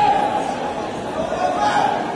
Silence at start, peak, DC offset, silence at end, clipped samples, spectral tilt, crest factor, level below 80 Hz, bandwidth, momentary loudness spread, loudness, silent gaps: 0 s; -6 dBFS; under 0.1%; 0 s; under 0.1%; -4.5 dB/octave; 14 dB; -48 dBFS; 11 kHz; 8 LU; -21 LUFS; none